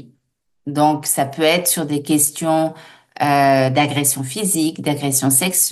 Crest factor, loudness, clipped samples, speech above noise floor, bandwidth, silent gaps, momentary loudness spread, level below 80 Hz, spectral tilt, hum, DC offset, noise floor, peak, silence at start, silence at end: 16 dB; -17 LUFS; under 0.1%; 53 dB; 13 kHz; none; 7 LU; -64 dBFS; -3.5 dB/octave; none; under 0.1%; -70 dBFS; -2 dBFS; 0.65 s; 0 s